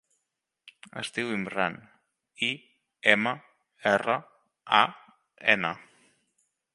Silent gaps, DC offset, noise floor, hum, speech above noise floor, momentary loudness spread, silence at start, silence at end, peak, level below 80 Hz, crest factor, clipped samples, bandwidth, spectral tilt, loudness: none; under 0.1%; -83 dBFS; none; 56 dB; 16 LU; 0.95 s; 0.95 s; -2 dBFS; -72 dBFS; 28 dB; under 0.1%; 11.5 kHz; -4 dB/octave; -27 LUFS